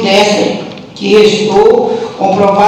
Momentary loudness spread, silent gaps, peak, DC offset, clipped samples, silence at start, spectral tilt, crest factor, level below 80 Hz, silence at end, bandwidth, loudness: 11 LU; none; 0 dBFS; under 0.1%; 1%; 0 s; -4.5 dB/octave; 8 dB; -44 dBFS; 0 s; 11.5 kHz; -9 LUFS